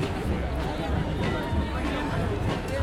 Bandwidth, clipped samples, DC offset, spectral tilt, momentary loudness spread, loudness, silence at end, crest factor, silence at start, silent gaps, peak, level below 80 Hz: 15 kHz; under 0.1%; under 0.1%; -6.5 dB/octave; 2 LU; -29 LUFS; 0 s; 12 dB; 0 s; none; -14 dBFS; -34 dBFS